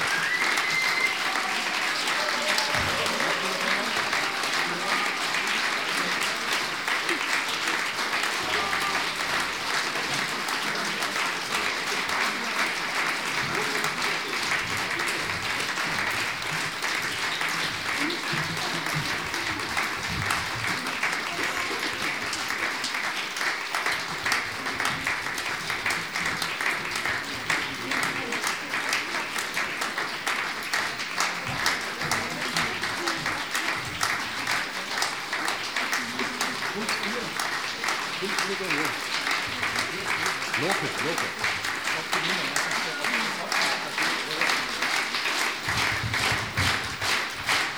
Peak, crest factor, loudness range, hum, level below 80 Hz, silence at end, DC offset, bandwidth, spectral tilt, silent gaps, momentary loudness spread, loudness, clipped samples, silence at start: -4 dBFS; 24 dB; 3 LU; none; -58 dBFS; 0 s; 0.2%; over 20 kHz; -1.5 dB/octave; none; 3 LU; -26 LUFS; under 0.1%; 0 s